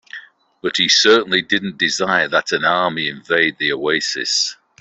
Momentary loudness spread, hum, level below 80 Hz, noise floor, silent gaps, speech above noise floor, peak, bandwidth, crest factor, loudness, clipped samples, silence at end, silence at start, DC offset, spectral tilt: 10 LU; none; -62 dBFS; -39 dBFS; none; 22 dB; -2 dBFS; 8.4 kHz; 16 dB; -16 LUFS; under 0.1%; 0.25 s; 0.15 s; under 0.1%; -2 dB/octave